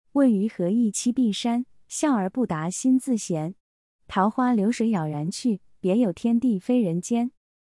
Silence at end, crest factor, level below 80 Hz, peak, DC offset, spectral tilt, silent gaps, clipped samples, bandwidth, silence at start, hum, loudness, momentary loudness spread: 0.35 s; 16 dB; -64 dBFS; -8 dBFS; under 0.1%; -5.5 dB/octave; 3.60-3.99 s; under 0.1%; 12 kHz; 0.15 s; none; -24 LUFS; 7 LU